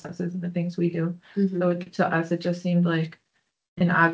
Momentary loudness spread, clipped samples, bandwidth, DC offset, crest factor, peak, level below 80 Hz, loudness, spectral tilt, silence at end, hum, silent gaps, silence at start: 7 LU; under 0.1%; 7.6 kHz; under 0.1%; 18 dB; -6 dBFS; -68 dBFS; -26 LUFS; -8 dB/octave; 0 s; none; 3.68-3.76 s; 0.05 s